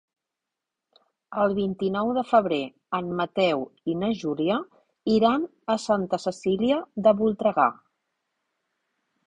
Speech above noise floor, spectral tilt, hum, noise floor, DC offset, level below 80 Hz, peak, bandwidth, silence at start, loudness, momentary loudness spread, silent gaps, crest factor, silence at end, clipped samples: 62 dB; -6.5 dB/octave; none; -86 dBFS; under 0.1%; -64 dBFS; -6 dBFS; 9.8 kHz; 1.3 s; -25 LUFS; 8 LU; none; 20 dB; 1.55 s; under 0.1%